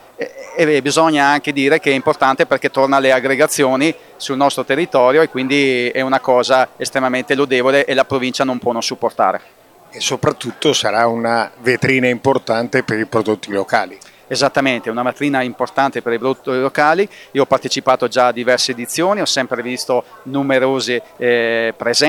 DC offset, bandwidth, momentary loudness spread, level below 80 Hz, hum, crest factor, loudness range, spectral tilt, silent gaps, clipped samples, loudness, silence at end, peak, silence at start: under 0.1%; 18 kHz; 6 LU; -60 dBFS; none; 16 dB; 3 LU; -4 dB/octave; none; under 0.1%; -16 LUFS; 0 s; 0 dBFS; 0.2 s